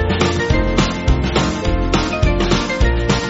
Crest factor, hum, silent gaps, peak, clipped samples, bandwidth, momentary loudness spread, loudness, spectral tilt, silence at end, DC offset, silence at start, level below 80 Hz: 14 dB; none; none; 0 dBFS; under 0.1%; 8 kHz; 2 LU; -17 LUFS; -5 dB/octave; 0 s; under 0.1%; 0 s; -20 dBFS